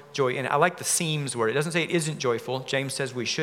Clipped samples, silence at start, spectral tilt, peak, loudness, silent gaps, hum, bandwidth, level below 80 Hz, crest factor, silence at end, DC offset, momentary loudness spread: under 0.1%; 0 s; -3.5 dB/octave; -6 dBFS; -26 LUFS; none; none; 17.5 kHz; -78 dBFS; 20 dB; 0 s; under 0.1%; 5 LU